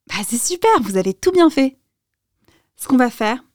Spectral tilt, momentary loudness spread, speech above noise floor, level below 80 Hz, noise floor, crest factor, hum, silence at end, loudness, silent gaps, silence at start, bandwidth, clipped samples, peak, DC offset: -4 dB/octave; 8 LU; 59 dB; -54 dBFS; -76 dBFS; 14 dB; none; 0.15 s; -17 LUFS; none; 0.1 s; 19.5 kHz; under 0.1%; -4 dBFS; 0.5%